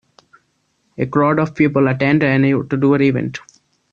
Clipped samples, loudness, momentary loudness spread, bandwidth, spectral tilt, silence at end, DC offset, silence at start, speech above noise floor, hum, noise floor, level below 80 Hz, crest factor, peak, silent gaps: under 0.1%; -16 LUFS; 9 LU; 7 kHz; -8.5 dB/octave; 0.55 s; under 0.1%; 1 s; 50 dB; none; -65 dBFS; -54 dBFS; 14 dB; -2 dBFS; none